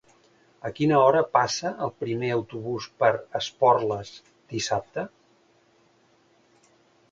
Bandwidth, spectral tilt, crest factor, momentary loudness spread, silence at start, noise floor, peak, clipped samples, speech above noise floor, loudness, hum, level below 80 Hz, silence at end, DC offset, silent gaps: 9 kHz; -5 dB/octave; 22 dB; 16 LU; 0.65 s; -62 dBFS; -4 dBFS; under 0.1%; 38 dB; -25 LUFS; none; -64 dBFS; 2.05 s; under 0.1%; none